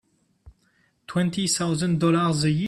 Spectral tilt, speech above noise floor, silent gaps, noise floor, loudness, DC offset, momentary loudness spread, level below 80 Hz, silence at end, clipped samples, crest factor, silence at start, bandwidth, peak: -5 dB/octave; 43 dB; none; -66 dBFS; -23 LUFS; under 0.1%; 5 LU; -56 dBFS; 0 s; under 0.1%; 14 dB; 0.45 s; 13 kHz; -10 dBFS